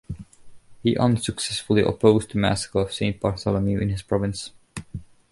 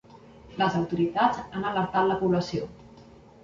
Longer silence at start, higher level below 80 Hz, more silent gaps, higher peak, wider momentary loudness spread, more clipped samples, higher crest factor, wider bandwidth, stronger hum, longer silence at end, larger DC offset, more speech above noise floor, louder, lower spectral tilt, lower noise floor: about the same, 0.1 s vs 0.15 s; first, -44 dBFS vs -56 dBFS; neither; first, -4 dBFS vs -8 dBFS; first, 19 LU vs 10 LU; neither; about the same, 20 dB vs 20 dB; first, 11.5 kHz vs 7.6 kHz; neither; about the same, 0.3 s vs 0.4 s; neither; about the same, 22 dB vs 25 dB; first, -23 LUFS vs -26 LUFS; about the same, -5.5 dB/octave vs -6.5 dB/octave; second, -44 dBFS vs -51 dBFS